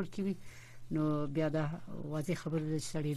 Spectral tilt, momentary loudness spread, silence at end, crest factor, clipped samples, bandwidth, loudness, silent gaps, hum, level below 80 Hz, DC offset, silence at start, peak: -6.5 dB/octave; 10 LU; 0 s; 12 dB; under 0.1%; 13.5 kHz; -37 LUFS; none; none; -58 dBFS; under 0.1%; 0 s; -22 dBFS